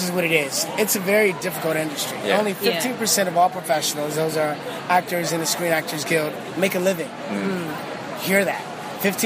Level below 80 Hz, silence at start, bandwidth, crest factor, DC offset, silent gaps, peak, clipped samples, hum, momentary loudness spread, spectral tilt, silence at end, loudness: -68 dBFS; 0 s; 15.5 kHz; 20 dB; under 0.1%; none; -2 dBFS; under 0.1%; none; 9 LU; -3 dB/octave; 0 s; -22 LUFS